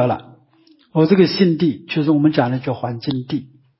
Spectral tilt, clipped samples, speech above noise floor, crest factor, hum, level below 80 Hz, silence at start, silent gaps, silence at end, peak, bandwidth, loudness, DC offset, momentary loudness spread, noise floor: -11 dB/octave; under 0.1%; 37 dB; 16 dB; none; -58 dBFS; 0 s; none; 0.35 s; -2 dBFS; 5.8 kHz; -18 LUFS; under 0.1%; 11 LU; -54 dBFS